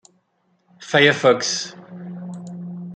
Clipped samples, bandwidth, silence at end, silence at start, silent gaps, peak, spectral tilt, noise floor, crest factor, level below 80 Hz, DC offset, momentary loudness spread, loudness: under 0.1%; 9.4 kHz; 0 s; 0.8 s; none; -2 dBFS; -3.5 dB/octave; -66 dBFS; 20 dB; -66 dBFS; under 0.1%; 20 LU; -17 LUFS